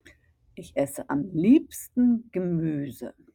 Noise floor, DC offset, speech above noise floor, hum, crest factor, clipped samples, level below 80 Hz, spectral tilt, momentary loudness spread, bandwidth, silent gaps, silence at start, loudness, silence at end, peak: -58 dBFS; under 0.1%; 33 dB; none; 18 dB; under 0.1%; -60 dBFS; -7 dB/octave; 15 LU; 17.5 kHz; none; 0.55 s; -25 LUFS; 0.25 s; -8 dBFS